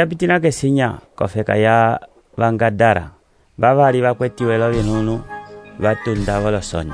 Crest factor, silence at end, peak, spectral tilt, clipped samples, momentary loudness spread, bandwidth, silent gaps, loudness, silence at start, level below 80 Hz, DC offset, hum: 16 dB; 0 s; -2 dBFS; -6.5 dB/octave; under 0.1%; 12 LU; 10.5 kHz; none; -17 LUFS; 0 s; -38 dBFS; under 0.1%; none